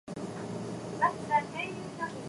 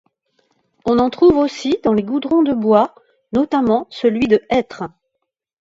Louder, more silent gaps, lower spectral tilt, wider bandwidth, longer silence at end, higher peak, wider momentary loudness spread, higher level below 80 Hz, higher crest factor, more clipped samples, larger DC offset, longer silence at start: second, -33 LUFS vs -16 LUFS; neither; about the same, -5.5 dB/octave vs -6.5 dB/octave; first, 11.5 kHz vs 7.8 kHz; second, 0 s vs 0.75 s; second, -14 dBFS vs -2 dBFS; about the same, 9 LU vs 9 LU; second, -66 dBFS vs -48 dBFS; about the same, 20 dB vs 16 dB; neither; neither; second, 0.05 s vs 0.85 s